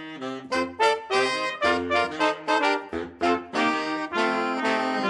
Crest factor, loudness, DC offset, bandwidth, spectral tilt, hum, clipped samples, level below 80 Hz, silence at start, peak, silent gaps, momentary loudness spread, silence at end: 18 dB; -25 LUFS; under 0.1%; 11.5 kHz; -3.5 dB/octave; none; under 0.1%; -60 dBFS; 0 s; -8 dBFS; none; 6 LU; 0 s